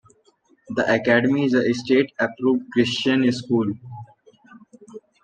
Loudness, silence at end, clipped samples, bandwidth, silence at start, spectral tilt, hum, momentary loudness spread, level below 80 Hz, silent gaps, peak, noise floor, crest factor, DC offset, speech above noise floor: -21 LUFS; 0.25 s; under 0.1%; 9 kHz; 0.7 s; -6 dB/octave; none; 11 LU; -64 dBFS; none; -4 dBFS; -60 dBFS; 18 dB; under 0.1%; 40 dB